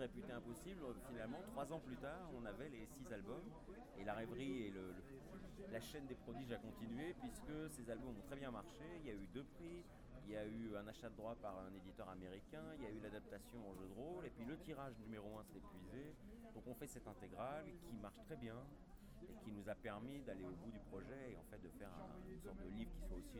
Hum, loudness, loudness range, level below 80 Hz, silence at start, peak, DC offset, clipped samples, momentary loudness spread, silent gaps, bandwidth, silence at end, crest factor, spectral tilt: none; -54 LUFS; 3 LU; -64 dBFS; 0 s; -36 dBFS; under 0.1%; under 0.1%; 8 LU; none; over 20 kHz; 0 s; 18 dB; -6 dB/octave